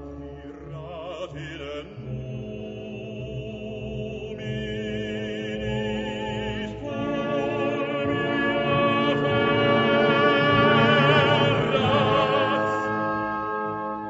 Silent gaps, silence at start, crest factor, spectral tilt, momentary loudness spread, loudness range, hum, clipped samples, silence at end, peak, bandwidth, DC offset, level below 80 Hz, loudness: none; 0 s; 18 dB; -6.5 dB/octave; 17 LU; 15 LU; none; under 0.1%; 0 s; -6 dBFS; 8 kHz; under 0.1%; -48 dBFS; -23 LUFS